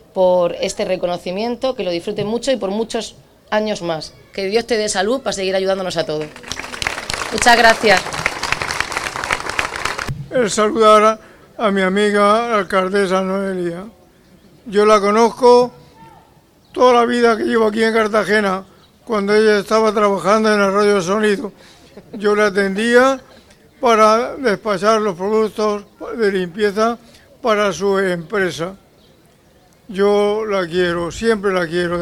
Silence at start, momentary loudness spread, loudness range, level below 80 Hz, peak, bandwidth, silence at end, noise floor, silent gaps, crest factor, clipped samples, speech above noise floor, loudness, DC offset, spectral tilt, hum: 0.15 s; 11 LU; 5 LU; -48 dBFS; 0 dBFS; 15.5 kHz; 0 s; -51 dBFS; none; 16 dB; under 0.1%; 35 dB; -16 LUFS; under 0.1%; -4 dB/octave; none